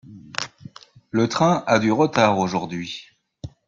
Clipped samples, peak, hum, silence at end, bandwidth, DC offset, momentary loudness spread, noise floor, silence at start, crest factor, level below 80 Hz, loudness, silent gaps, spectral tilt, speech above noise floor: under 0.1%; -2 dBFS; none; 0.2 s; 7.8 kHz; under 0.1%; 16 LU; -44 dBFS; 0.05 s; 20 dB; -58 dBFS; -21 LUFS; none; -5.5 dB/octave; 24 dB